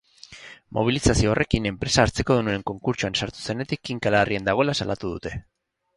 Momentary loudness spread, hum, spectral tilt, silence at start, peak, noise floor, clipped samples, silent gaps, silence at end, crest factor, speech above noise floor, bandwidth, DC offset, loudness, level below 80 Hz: 12 LU; none; -5 dB/octave; 0.3 s; -2 dBFS; -45 dBFS; under 0.1%; none; 0.55 s; 22 dB; 22 dB; 11.5 kHz; under 0.1%; -23 LUFS; -38 dBFS